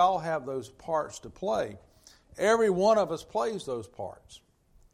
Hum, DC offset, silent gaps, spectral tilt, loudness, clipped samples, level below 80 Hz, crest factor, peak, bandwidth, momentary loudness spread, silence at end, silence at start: none; under 0.1%; none; -5 dB/octave; -29 LUFS; under 0.1%; -62 dBFS; 18 dB; -12 dBFS; 14 kHz; 16 LU; 0.55 s; 0 s